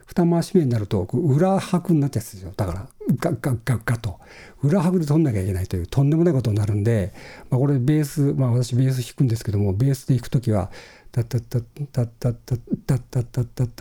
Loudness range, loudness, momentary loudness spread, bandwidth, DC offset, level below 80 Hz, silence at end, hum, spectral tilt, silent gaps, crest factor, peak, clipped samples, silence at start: 4 LU; -22 LUFS; 9 LU; 17.5 kHz; under 0.1%; -46 dBFS; 0.05 s; none; -8 dB/octave; none; 16 dB; -6 dBFS; under 0.1%; 0.1 s